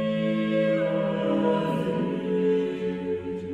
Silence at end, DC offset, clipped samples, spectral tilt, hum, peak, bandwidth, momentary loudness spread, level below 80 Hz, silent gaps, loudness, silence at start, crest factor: 0 s; under 0.1%; under 0.1%; -8 dB/octave; none; -12 dBFS; 10 kHz; 6 LU; -60 dBFS; none; -26 LUFS; 0 s; 14 dB